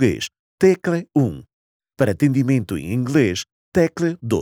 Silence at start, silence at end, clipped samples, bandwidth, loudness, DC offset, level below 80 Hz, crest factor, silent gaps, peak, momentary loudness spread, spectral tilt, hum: 0 s; 0 s; under 0.1%; 17 kHz; -20 LUFS; under 0.1%; -50 dBFS; 16 dB; 0.39-0.58 s, 1.53-1.80 s, 3.52-3.72 s; -4 dBFS; 8 LU; -6.5 dB/octave; none